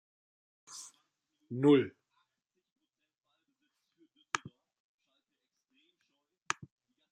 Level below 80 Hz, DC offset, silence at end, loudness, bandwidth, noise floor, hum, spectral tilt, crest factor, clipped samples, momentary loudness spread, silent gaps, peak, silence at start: -84 dBFS; under 0.1%; 2.65 s; -32 LUFS; 11 kHz; -86 dBFS; none; -5.5 dB/octave; 26 dB; under 0.1%; 22 LU; 2.72-2.76 s; -14 dBFS; 0.7 s